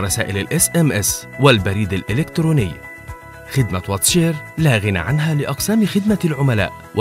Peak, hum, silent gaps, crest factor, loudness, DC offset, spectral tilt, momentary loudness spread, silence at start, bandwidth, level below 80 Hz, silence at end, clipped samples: 0 dBFS; none; none; 18 dB; -17 LUFS; under 0.1%; -4.5 dB/octave; 8 LU; 0 s; 16.5 kHz; -40 dBFS; 0 s; under 0.1%